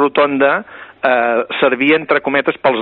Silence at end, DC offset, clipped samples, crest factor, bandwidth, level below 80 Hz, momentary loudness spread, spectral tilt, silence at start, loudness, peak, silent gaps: 0 s; under 0.1%; under 0.1%; 14 dB; 4.6 kHz; -60 dBFS; 6 LU; -2 dB/octave; 0 s; -14 LUFS; 0 dBFS; none